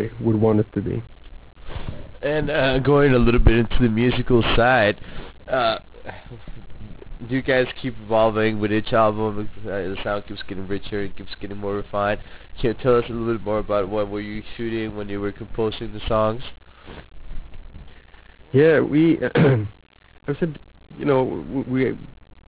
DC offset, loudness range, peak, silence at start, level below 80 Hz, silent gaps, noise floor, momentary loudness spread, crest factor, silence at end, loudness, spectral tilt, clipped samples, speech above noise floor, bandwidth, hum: under 0.1%; 9 LU; -6 dBFS; 0 s; -34 dBFS; none; -44 dBFS; 22 LU; 16 dB; 0.35 s; -21 LUFS; -11 dB/octave; under 0.1%; 24 dB; 4 kHz; none